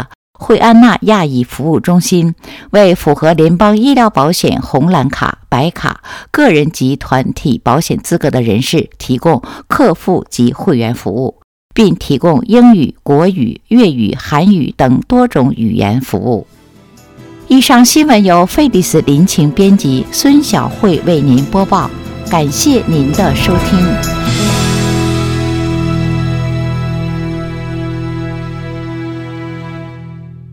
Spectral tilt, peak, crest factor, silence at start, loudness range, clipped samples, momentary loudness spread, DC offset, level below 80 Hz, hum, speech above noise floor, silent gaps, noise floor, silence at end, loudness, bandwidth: -5.5 dB/octave; 0 dBFS; 10 dB; 0 s; 6 LU; 0.7%; 13 LU; under 0.1%; -32 dBFS; none; 31 dB; 0.15-0.33 s, 11.44-11.69 s; -40 dBFS; 0.1 s; -11 LUFS; 18.5 kHz